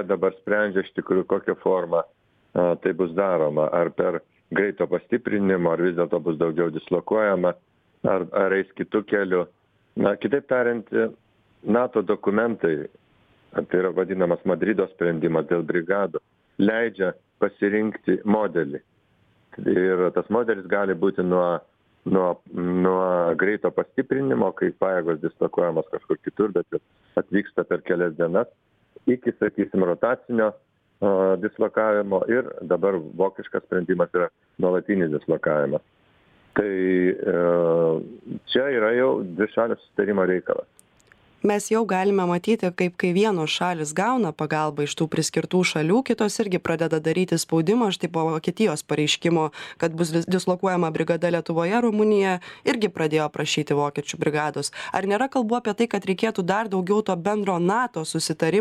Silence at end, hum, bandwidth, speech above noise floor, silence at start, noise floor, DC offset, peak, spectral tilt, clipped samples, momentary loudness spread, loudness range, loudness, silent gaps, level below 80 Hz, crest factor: 0 s; none; 14 kHz; 40 dB; 0 s; -63 dBFS; under 0.1%; -6 dBFS; -5.5 dB/octave; under 0.1%; 6 LU; 2 LU; -23 LUFS; none; -64 dBFS; 18 dB